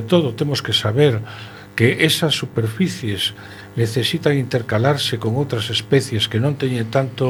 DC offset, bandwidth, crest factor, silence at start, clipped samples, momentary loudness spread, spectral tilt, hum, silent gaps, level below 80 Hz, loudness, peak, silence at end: under 0.1%; 19 kHz; 18 dB; 0 s; under 0.1%; 7 LU; -5 dB/octave; none; none; -54 dBFS; -19 LUFS; 0 dBFS; 0 s